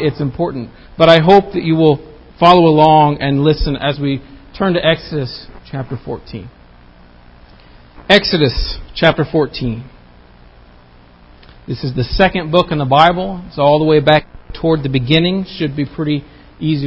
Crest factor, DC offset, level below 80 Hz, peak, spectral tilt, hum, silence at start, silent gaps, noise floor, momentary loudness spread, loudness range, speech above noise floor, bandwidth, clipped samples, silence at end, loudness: 14 dB; under 0.1%; -32 dBFS; 0 dBFS; -7.5 dB/octave; none; 0 s; none; -43 dBFS; 17 LU; 9 LU; 30 dB; 8 kHz; 0.2%; 0 s; -13 LUFS